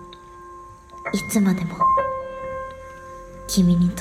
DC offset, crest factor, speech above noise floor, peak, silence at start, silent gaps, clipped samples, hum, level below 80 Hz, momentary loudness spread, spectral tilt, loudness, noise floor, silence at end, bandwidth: under 0.1%; 16 dB; 23 dB; -8 dBFS; 0 s; none; under 0.1%; none; -44 dBFS; 23 LU; -6 dB/octave; -22 LUFS; -42 dBFS; 0 s; 15.5 kHz